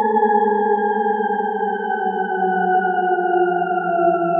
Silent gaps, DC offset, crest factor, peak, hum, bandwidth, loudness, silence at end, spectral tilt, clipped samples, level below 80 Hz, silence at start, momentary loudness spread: none; under 0.1%; 12 dB; -6 dBFS; none; 3.6 kHz; -19 LUFS; 0 s; -11 dB/octave; under 0.1%; -86 dBFS; 0 s; 5 LU